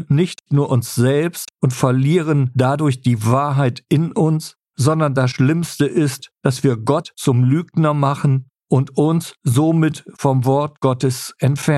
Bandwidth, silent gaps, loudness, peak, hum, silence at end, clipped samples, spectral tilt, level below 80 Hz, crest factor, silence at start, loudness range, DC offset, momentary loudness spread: 13 kHz; none; -18 LUFS; -2 dBFS; none; 0 s; under 0.1%; -7 dB/octave; -56 dBFS; 16 dB; 0 s; 1 LU; under 0.1%; 5 LU